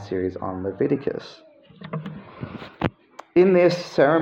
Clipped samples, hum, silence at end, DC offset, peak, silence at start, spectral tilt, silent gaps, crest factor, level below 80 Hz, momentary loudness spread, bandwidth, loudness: under 0.1%; none; 0 s; under 0.1%; -4 dBFS; 0 s; -7.5 dB/octave; none; 18 dB; -56 dBFS; 20 LU; 7.8 kHz; -22 LUFS